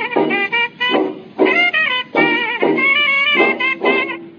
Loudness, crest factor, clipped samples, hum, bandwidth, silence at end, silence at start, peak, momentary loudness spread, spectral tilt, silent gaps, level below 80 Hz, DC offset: -14 LUFS; 16 dB; under 0.1%; none; 7 kHz; 0.05 s; 0 s; 0 dBFS; 5 LU; -5 dB/octave; none; -74 dBFS; under 0.1%